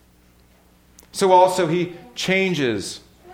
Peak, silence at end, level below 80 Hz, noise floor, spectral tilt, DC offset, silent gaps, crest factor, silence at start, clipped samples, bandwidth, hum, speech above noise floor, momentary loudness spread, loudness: -2 dBFS; 0 s; -56 dBFS; -54 dBFS; -4.5 dB/octave; under 0.1%; none; 20 dB; 1.15 s; under 0.1%; 16.5 kHz; 60 Hz at -50 dBFS; 35 dB; 17 LU; -19 LUFS